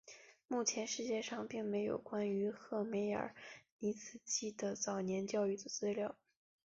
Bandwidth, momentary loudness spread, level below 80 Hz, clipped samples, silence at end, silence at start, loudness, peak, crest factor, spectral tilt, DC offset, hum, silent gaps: 7.6 kHz; 10 LU; -80 dBFS; under 0.1%; 0.5 s; 0.05 s; -40 LUFS; -22 dBFS; 18 dB; -4.5 dB/octave; under 0.1%; none; 3.72-3.79 s